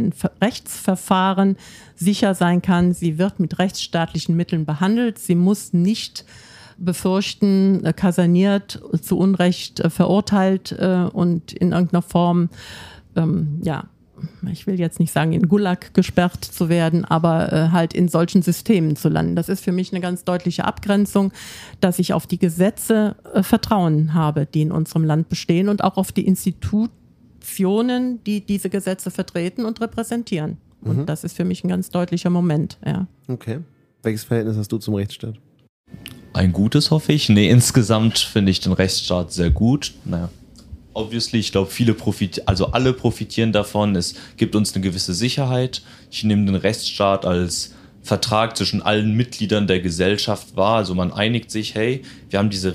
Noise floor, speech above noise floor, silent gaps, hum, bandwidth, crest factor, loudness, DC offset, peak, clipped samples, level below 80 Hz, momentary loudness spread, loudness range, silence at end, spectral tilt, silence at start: -41 dBFS; 22 dB; 35.69-35.84 s; none; 15.5 kHz; 18 dB; -19 LUFS; under 0.1%; -2 dBFS; under 0.1%; -42 dBFS; 9 LU; 5 LU; 0 s; -6 dB/octave; 0 s